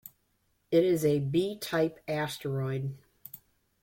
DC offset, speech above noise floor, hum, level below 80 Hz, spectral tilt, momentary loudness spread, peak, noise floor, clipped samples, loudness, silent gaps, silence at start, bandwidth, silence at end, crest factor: under 0.1%; 45 dB; none; -66 dBFS; -6.5 dB/octave; 21 LU; -12 dBFS; -73 dBFS; under 0.1%; -30 LUFS; none; 0.05 s; 16.5 kHz; 0.45 s; 18 dB